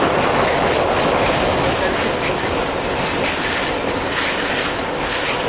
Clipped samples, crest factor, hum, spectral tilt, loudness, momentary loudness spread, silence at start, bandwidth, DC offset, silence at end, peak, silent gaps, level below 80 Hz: under 0.1%; 14 dB; none; -9 dB/octave; -18 LUFS; 4 LU; 0 s; 4 kHz; under 0.1%; 0 s; -4 dBFS; none; -36 dBFS